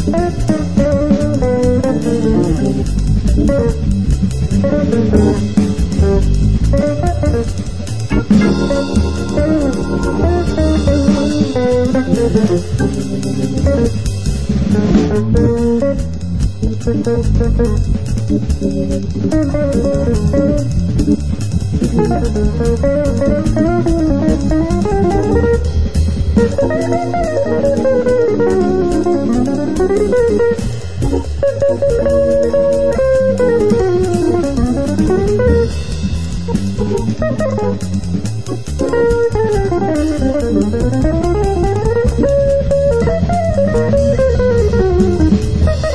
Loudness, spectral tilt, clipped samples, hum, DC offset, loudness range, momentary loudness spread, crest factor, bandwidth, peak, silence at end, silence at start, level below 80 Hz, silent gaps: -14 LUFS; -7.5 dB/octave; under 0.1%; none; 4%; 3 LU; 5 LU; 14 dB; 11 kHz; 0 dBFS; 0 s; 0 s; -20 dBFS; none